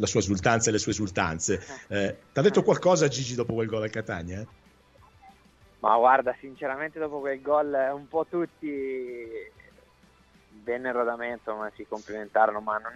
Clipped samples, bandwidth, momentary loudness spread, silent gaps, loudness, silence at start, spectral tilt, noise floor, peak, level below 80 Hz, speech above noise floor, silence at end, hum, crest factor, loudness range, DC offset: under 0.1%; 8.4 kHz; 14 LU; none; -27 LUFS; 0 s; -4.5 dB/octave; -59 dBFS; -6 dBFS; -58 dBFS; 33 dB; 0 s; none; 20 dB; 8 LU; under 0.1%